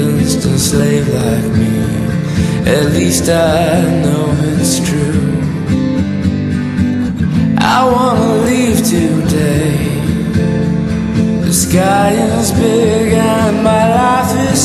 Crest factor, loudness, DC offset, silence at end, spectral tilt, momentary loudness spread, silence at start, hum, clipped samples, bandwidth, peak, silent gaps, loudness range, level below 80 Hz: 12 dB; -12 LUFS; under 0.1%; 0 s; -5.5 dB/octave; 5 LU; 0 s; none; under 0.1%; 13.5 kHz; 0 dBFS; none; 2 LU; -28 dBFS